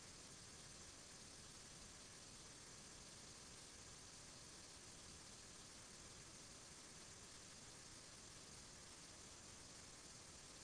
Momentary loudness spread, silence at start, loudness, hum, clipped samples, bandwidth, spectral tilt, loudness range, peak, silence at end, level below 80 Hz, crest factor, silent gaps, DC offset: 0 LU; 0 s; -58 LUFS; none; under 0.1%; 11 kHz; -2 dB/octave; 0 LU; -48 dBFS; 0 s; -72 dBFS; 12 dB; none; under 0.1%